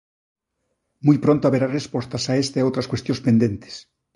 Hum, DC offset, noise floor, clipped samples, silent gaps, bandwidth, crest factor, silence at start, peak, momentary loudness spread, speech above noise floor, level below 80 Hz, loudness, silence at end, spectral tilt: none; under 0.1%; -75 dBFS; under 0.1%; none; 11.5 kHz; 18 dB; 1.05 s; -2 dBFS; 10 LU; 55 dB; -54 dBFS; -21 LUFS; 0.35 s; -6.5 dB/octave